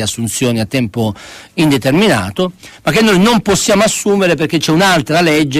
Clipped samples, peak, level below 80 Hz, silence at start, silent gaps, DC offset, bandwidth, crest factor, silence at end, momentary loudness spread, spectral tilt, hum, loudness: under 0.1%; 0 dBFS; -42 dBFS; 0 s; none; under 0.1%; 15.5 kHz; 12 dB; 0 s; 9 LU; -4.5 dB/octave; none; -12 LUFS